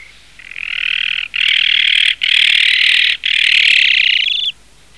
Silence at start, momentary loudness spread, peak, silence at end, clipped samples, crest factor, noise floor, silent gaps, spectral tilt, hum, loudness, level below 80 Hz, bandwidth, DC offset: 0.45 s; 10 LU; -2 dBFS; 0.45 s; under 0.1%; 12 dB; -39 dBFS; none; 3 dB/octave; none; -10 LUFS; -52 dBFS; 13.5 kHz; 0.5%